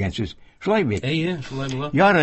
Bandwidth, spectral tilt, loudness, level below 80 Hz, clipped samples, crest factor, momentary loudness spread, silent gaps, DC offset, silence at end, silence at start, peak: 8.4 kHz; -6.5 dB/octave; -23 LUFS; -42 dBFS; under 0.1%; 18 dB; 12 LU; none; under 0.1%; 0 s; 0 s; -4 dBFS